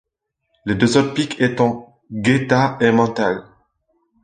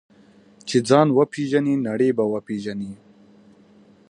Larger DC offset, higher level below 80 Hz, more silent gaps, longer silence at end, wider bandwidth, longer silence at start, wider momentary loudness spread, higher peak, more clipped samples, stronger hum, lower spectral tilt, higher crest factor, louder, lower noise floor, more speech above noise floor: neither; first, -52 dBFS vs -66 dBFS; neither; second, 0.8 s vs 1.15 s; second, 9.6 kHz vs 11 kHz; about the same, 0.65 s vs 0.65 s; about the same, 13 LU vs 15 LU; about the same, 0 dBFS vs -2 dBFS; neither; neither; about the same, -6 dB/octave vs -6.5 dB/octave; about the same, 18 dB vs 20 dB; first, -18 LUFS vs -21 LUFS; first, -74 dBFS vs -52 dBFS; first, 57 dB vs 32 dB